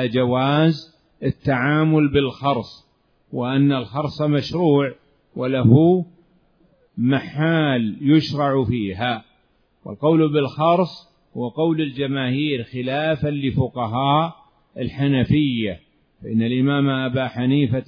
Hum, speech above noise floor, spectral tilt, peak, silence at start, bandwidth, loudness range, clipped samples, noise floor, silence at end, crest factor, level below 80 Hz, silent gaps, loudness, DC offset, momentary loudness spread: none; 43 dB; -8.5 dB/octave; 0 dBFS; 0 s; 5.4 kHz; 3 LU; under 0.1%; -62 dBFS; 0.05 s; 20 dB; -50 dBFS; none; -20 LUFS; under 0.1%; 11 LU